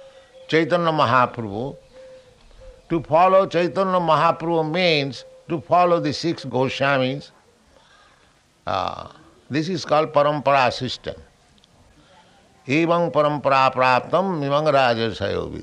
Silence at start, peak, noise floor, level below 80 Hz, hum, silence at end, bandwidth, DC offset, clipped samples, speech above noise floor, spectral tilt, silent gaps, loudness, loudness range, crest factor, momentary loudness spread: 0.05 s; -2 dBFS; -57 dBFS; -56 dBFS; none; 0 s; 10.5 kHz; under 0.1%; under 0.1%; 38 dB; -6 dB/octave; none; -20 LUFS; 6 LU; 18 dB; 12 LU